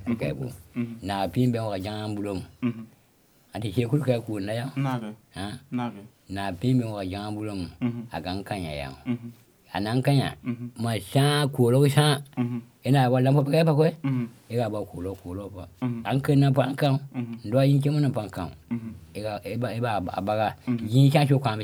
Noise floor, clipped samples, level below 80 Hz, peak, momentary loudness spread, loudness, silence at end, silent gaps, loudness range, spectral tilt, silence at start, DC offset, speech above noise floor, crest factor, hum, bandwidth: -61 dBFS; under 0.1%; -58 dBFS; -8 dBFS; 14 LU; -26 LUFS; 0 s; none; 7 LU; -7 dB/octave; 0 s; under 0.1%; 36 dB; 18 dB; none; 15.5 kHz